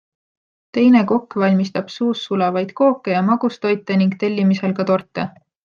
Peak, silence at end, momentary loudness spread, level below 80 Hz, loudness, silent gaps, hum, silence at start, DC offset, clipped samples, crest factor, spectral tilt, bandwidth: -4 dBFS; 0.35 s; 8 LU; -64 dBFS; -18 LUFS; none; none; 0.75 s; under 0.1%; under 0.1%; 14 dB; -7.5 dB/octave; 7 kHz